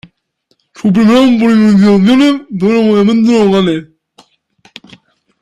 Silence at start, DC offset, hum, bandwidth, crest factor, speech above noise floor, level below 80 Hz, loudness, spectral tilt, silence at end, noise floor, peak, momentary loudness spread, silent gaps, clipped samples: 0.8 s; under 0.1%; none; 10.5 kHz; 10 dB; 52 dB; -48 dBFS; -9 LUFS; -7 dB/octave; 1.6 s; -60 dBFS; 0 dBFS; 7 LU; none; under 0.1%